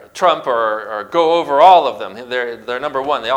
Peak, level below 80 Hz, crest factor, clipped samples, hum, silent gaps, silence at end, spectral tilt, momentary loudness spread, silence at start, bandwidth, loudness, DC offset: 0 dBFS; -60 dBFS; 14 dB; under 0.1%; none; none; 0 s; -4 dB/octave; 14 LU; 0.15 s; 12.5 kHz; -15 LUFS; under 0.1%